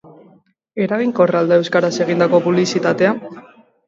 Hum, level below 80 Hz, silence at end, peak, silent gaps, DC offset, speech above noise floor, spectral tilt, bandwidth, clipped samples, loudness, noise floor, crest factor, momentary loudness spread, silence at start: none; -66 dBFS; 0.45 s; -2 dBFS; none; under 0.1%; 37 dB; -6 dB/octave; 7.8 kHz; under 0.1%; -16 LUFS; -52 dBFS; 16 dB; 9 LU; 0.75 s